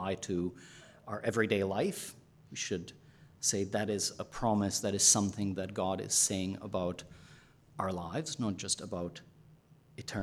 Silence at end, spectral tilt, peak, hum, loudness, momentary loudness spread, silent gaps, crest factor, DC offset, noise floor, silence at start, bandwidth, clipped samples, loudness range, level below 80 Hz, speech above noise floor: 0 s; -3 dB/octave; -12 dBFS; none; -33 LUFS; 18 LU; none; 22 dB; under 0.1%; -61 dBFS; 0 s; 17 kHz; under 0.1%; 8 LU; -64 dBFS; 27 dB